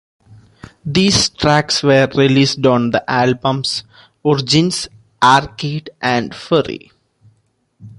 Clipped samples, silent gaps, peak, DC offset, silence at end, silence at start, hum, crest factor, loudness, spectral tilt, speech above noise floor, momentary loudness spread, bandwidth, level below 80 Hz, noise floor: under 0.1%; none; 0 dBFS; under 0.1%; 0.1 s; 0.85 s; none; 16 dB; -15 LUFS; -4.5 dB/octave; 46 dB; 11 LU; 11.5 kHz; -46 dBFS; -61 dBFS